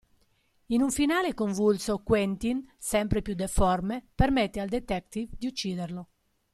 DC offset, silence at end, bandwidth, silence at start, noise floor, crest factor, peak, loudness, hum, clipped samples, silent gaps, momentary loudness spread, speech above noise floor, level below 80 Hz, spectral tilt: under 0.1%; 0.5 s; 15 kHz; 0.7 s; -68 dBFS; 20 dB; -8 dBFS; -28 LUFS; none; under 0.1%; none; 9 LU; 41 dB; -40 dBFS; -5 dB/octave